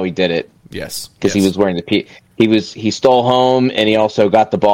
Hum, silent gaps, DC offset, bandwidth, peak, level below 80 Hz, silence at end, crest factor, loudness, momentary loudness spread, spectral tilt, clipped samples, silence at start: none; none; under 0.1%; 16.5 kHz; 0 dBFS; -50 dBFS; 0 s; 14 dB; -14 LUFS; 13 LU; -5.5 dB/octave; under 0.1%; 0 s